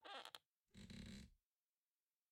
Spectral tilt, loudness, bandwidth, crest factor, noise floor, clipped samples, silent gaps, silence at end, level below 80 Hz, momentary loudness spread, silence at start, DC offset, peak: -4 dB/octave; -59 LUFS; 15 kHz; 28 dB; under -90 dBFS; under 0.1%; 0.48-0.65 s; 0.95 s; -72 dBFS; 9 LU; 0 s; under 0.1%; -34 dBFS